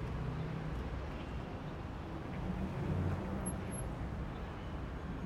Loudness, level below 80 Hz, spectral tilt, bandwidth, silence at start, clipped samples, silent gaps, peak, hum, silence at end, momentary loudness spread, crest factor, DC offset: -41 LUFS; -46 dBFS; -6.5 dB/octave; 16 kHz; 0 s; under 0.1%; none; -24 dBFS; none; 0 s; 7 LU; 16 dB; under 0.1%